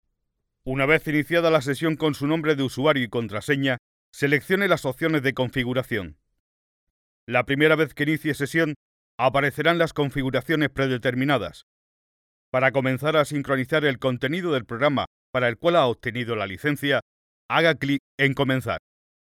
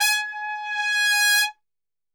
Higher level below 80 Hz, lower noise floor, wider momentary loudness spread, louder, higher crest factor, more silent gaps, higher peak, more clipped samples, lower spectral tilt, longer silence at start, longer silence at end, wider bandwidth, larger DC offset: first, -54 dBFS vs -78 dBFS; second, -77 dBFS vs under -90 dBFS; second, 7 LU vs 11 LU; second, -23 LUFS vs -20 LUFS; about the same, 20 dB vs 18 dB; first, 3.79-4.13 s, 6.39-7.27 s, 8.76-9.18 s, 11.63-12.52 s, 15.07-15.33 s, 17.02-17.49 s, 18.00-18.18 s vs none; about the same, -4 dBFS vs -6 dBFS; neither; first, -6 dB/octave vs 9.5 dB/octave; first, 0.65 s vs 0 s; second, 0.5 s vs 0.65 s; second, 17 kHz vs over 20 kHz; neither